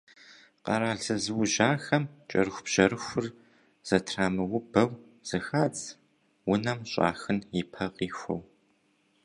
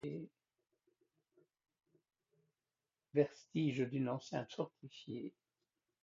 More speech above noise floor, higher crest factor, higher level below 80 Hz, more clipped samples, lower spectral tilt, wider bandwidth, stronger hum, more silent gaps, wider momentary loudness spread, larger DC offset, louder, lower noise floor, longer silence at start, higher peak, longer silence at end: second, 41 dB vs over 49 dB; about the same, 24 dB vs 24 dB; first, -60 dBFS vs -84 dBFS; neither; second, -4.5 dB/octave vs -6.5 dB/octave; first, 11.5 kHz vs 7.4 kHz; neither; neither; about the same, 12 LU vs 14 LU; neither; first, -29 LUFS vs -41 LUFS; second, -69 dBFS vs under -90 dBFS; first, 0.3 s vs 0.05 s; first, -6 dBFS vs -20 dBFS; about the same, 0.8 s vs 0.7 s